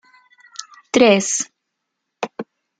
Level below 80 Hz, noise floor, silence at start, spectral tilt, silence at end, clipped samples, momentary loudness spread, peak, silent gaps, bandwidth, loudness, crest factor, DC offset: -62 dBFS; -78 dBFS; 0.6 s; -3 dB/octave; 0.35 s; under 0.1%; 22 LU; -2 dBFS; none; 9.6 kHz; -17 LUFS; 20 dB; under 0.1%